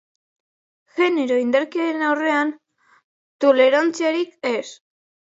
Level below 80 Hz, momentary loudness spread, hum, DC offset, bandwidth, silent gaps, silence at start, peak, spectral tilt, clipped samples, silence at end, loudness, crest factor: -80 dBFS; 10 LU; none; under 0.1%; 8 kHz; 3.04-3.39 s; 0.95 s; -4 dBFS; -3 dB/octave; under 0.1%; 0.5 s; -20 LUFS; 18 dB